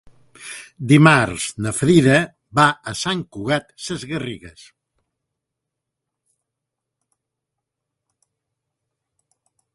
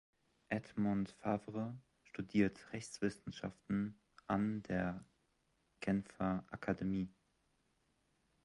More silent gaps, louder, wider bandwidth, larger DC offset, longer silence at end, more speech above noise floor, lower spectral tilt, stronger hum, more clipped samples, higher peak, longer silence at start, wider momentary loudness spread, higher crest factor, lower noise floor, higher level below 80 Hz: neither; first, -18 LUFS vs -41 LUFS; about the same, 11.5 kHz vs 11.5 kHz; neither; first, 5.25 s vs 1.35 s; first, 64 dB vs 40 dB; second, -5 dB/octave vs -7 dB/octave; neither; neither; first, 0 dBFS vs -20 dBFS; about the same, 0.4 s vs 0.5 s; first, 21 LU vs 10 LU; about the same, 22 dB vs 22 dB; about the same, -82 dBFS vs -80 dBFS; first, -52 dBFS vs -66 dBFS